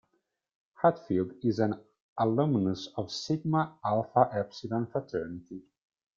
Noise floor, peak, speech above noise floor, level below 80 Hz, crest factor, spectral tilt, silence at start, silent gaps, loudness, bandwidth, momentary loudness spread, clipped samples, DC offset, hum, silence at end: -78 dBFS; -8 dBFS; 49 dB; -68 dBFS; 22 dB; -7 dB/octave; 0.8 s; 2.00-2.16 s; -30 LUFS; 7.6 kHz; 14 LU; under 0.1%; under 0.1%; none; 0.55 s